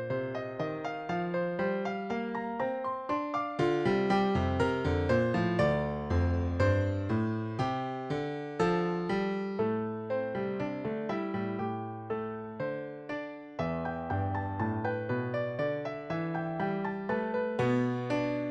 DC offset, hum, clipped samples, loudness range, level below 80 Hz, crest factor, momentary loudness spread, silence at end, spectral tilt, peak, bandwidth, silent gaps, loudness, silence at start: under 0.1%; none; under 0.1%; 6 LU; -52 dBFS; 16 dB; 8 LU; 0 s; -8 dB/octave; -14 dBFS; 9 kHz; none; -32 LUFS; 0 s